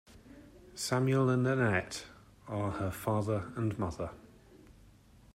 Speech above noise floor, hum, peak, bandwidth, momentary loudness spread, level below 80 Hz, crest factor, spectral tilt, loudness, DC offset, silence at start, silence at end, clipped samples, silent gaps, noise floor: 28 dB; none; -16 dBFS; 16 kHz; 14 LU; -60 dBFS; 18 dB; -6 dB/octave; -33 LUFS; under 0.1%; 0.1 s; 0.65 s; under 0.1%; none; -59 dBFS